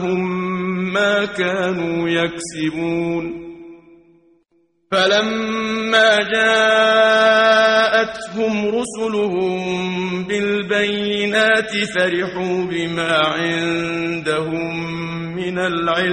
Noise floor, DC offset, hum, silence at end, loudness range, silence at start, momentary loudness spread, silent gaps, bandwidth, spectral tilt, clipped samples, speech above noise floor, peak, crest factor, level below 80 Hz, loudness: -62 dBFS; under 0.1%; none; 0 s; 7 LU; 0 s; 10 LU; none; 11 kHz; -4.5 dB/octave; under 0.1%; 44 dB; -2 dBFS; 16 dB; -54 dBFS; -17 LUFS